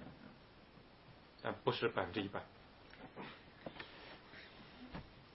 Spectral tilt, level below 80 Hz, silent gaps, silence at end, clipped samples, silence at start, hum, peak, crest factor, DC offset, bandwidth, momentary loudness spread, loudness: -3.5 dB/octave; -68 dBFS; none; 0 s; under 0.1%; 0 s; none; -18 dBFS; 28 dB; under 0.1%; 5.6 kHz; 23 LU; -45 LUFS